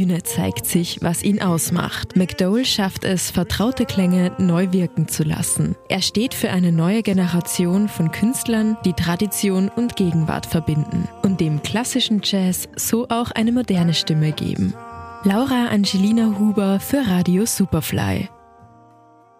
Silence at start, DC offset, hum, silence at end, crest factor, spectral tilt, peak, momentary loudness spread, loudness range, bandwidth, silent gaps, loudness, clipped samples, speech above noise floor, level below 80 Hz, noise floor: 0 s; under 0.1%; none; 0.75 s; 14 dB; -5 dB/octave; -4 dBFS; 4 LU; 1 LU; 15.5 kHz; none; -19 LUFS; under 0.1%; 31 dB; -46 dBFS; -50 dBFS